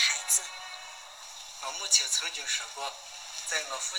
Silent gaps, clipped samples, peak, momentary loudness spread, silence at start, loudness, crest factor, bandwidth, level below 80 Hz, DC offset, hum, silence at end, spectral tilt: none; under 0.1%; -6 dBFS; 19 LU; 0 s; -28 LUFS; 26 dB; over 20 kHz; -72 dBFS; under 0.1%; none; 0 s; 4.5 dB/octave